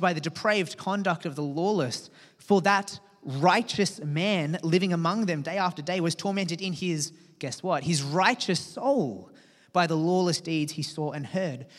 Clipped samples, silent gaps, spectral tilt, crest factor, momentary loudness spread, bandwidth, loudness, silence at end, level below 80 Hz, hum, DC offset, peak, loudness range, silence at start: under 0.1%; none; -5 dB/octave; 20 dB; 9 LU; 13.5 kHz; -27 LUFS; 0 s; -76 dBFS; none; under 0.1%; -6 dBFS; 2 LU; 0 s